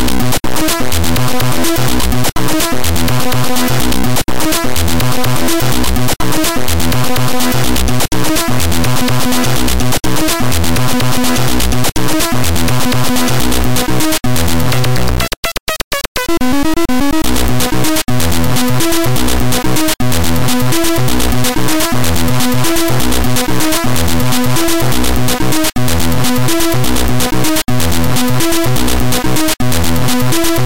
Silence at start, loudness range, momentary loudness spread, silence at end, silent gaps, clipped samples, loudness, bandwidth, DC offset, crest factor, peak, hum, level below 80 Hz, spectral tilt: 0 s; 1 LU; 2 LU; 0 s; 15.37-15.43 s, 15.60-15.66 s, 15.84-15.91 s, 16.08-16.15 s; under 0.1%; -13 LUFS; 17.5 kHz; 30%; 8 dB; -2 dBFS; none; -24 dBFS; -4 dB/octave